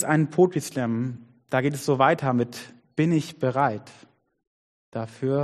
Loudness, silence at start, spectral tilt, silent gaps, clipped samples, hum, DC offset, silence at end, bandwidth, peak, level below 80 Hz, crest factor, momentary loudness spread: -25 LUFS; 0 s; -6.5 dB/octave; 4.47-4.92 s; under 0.1%; none; under 0.1%; 0 s; 13.5 kHz; -6 dBFS; -66 dBFS; 20 dB; 14 LU